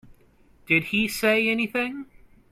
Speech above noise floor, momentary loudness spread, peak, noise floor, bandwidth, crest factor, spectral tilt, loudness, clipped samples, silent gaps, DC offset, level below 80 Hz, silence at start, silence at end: 33 dB; 9 LU; -6 dBFS; -57 dBFS; 16.5 kHz; 20 dB; -4.5 dB/octave; -23 LUFS; under 0.1%; none; under 0.1%; -56 dBFS; 0.7 s; 0.5 s